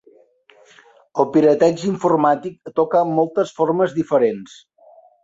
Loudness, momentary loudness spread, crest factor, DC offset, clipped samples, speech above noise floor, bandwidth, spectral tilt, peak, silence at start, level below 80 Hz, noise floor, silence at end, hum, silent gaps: -18 LUFS; 8 LU; 18 dB; under 0.1%; under 0.1%; 35 dB; 7.8 kHz; -7 dB/octave; -2 dBFS; 1.15 s; -62 dBFS; -52 dBFS; 0.8 s; none; none